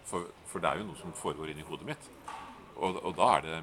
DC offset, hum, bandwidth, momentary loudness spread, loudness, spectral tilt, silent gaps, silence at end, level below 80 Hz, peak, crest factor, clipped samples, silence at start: under 0.1%; none; 17 kHz; 18 LU; -34 LUFS; -4 dB/octave; none; 0 s; -62 dBFS; -10 dBFS; 24 dB; under 0.1%; 0 s